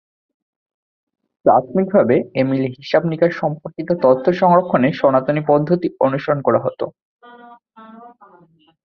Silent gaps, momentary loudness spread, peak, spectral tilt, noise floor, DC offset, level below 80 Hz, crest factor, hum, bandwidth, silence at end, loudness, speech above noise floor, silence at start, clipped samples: 7.02-7.19 s; 9 LU; -2 dBFS; -9 dB/octave; -52 dBFS; under 0.1%; -60 dBFS; 16 dB; none; 6.4 kHz; 0.75 s; -17 LUFS; 36 dB; 1.45 s; under 0.1%